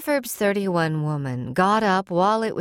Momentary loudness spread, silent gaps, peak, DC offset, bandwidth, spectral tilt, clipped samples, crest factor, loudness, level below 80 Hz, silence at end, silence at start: 7 LU; none; -6 dBFS; under 0.1%; 17 kHz; -5.5 dB/octave; under 0.1%; 16 dB; -22 LUFS; -60 dBFS; 0 s; 0 s